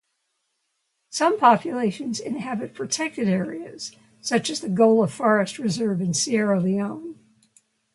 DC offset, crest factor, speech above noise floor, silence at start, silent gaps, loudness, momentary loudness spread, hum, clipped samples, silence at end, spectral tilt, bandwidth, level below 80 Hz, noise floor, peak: under 0.1%; 20 dB; 53 dB; 1.1 s; none; -22 LUFS; 15 LU; none; under 0.1%; 0.8 s; -4.5 dB/octave; 11.5 kHz; -68 dBFS; -75 dBFS; -2 dBFS